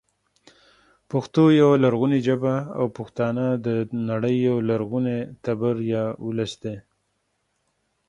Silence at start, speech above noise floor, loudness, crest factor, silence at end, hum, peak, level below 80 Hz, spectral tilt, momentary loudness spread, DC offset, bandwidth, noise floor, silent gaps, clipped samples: 1.1 s; 51 dB; -22 LUFS; 18 dB; 1.3 s; none; -6 dBFS; -62 dBFS; -8 dB/octave; 11 LU; under 0.1%; 9.8 kHz; -73 dBFS; none; under 0.1%